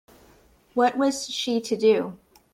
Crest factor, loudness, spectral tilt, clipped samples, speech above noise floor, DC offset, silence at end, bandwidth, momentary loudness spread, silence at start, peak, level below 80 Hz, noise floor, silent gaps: 16 dB; -24 LUFS; -3.5 dB/octave; under 0.1%; 34 dB; under 0.1%; 0.35 s; 15 kHz; 8 LU; 0.75 s; -8 dBFS; -64 dBFS; -57 dBFS; none